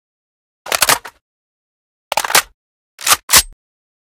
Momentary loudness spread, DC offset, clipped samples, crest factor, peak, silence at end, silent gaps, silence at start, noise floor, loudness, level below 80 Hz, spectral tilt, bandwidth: 12 LU; under 0.1%; 0.2%; 18 dB; 0 dBFS; 0.5 s; 1.21-2.11 s, 2.54-2.98 s, 3.23-3.28 s; 0.65 s; under -90 dBFS; -13 LUFS; -44 dBFS; 1 dB/octave; over 20 kHz